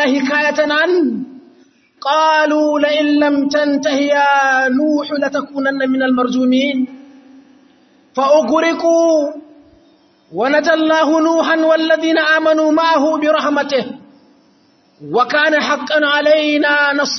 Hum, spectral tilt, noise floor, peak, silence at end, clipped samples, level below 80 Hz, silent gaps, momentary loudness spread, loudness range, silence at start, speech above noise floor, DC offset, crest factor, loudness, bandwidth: none; -3.5 dB/octave; -53 dBFS; 0 dBFS; 0 s; under 0.1%; -66 dBFS; none; 7 LU; 4 LU; 0 s; 39 dB; under 0.1%; 14 dB; -14 LUFS; 6.4 kHz